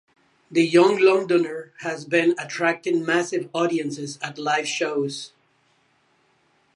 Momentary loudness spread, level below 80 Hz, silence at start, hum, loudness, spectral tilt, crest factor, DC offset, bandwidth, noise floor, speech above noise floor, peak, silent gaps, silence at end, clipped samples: 14 LU; -78 dBFS; 0.5 s; none; -22 LUFS; -4.5 dB/octave; 20 dB; under 0.1%; 11 kHz; -64 dBFS; 42 dB; -4 dBFS; none; 1.5 s; under 0.1%